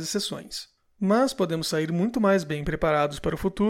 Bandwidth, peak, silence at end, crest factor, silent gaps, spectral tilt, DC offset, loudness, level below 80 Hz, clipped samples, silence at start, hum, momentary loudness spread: 16.5 kHz; -10 dBFS; 0 s; 14 dB; none; -5 dB/octave; under 0.1%; -25 LUFS; -46 dBFS; under 0.1%; 0 s; none; 8 LU